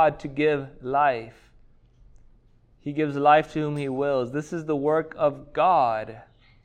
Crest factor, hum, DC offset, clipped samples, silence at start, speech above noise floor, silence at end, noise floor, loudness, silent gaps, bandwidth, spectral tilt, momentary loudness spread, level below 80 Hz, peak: 20 dB; none; under 0.1%; under 0.1%; 0 s; 33 dB; 0.45 s; -57 dBFS; -24 LUFS; none; 9.2 kHz; -7 dB/octave; 12 LU; -56 dBFS; -6 dBFS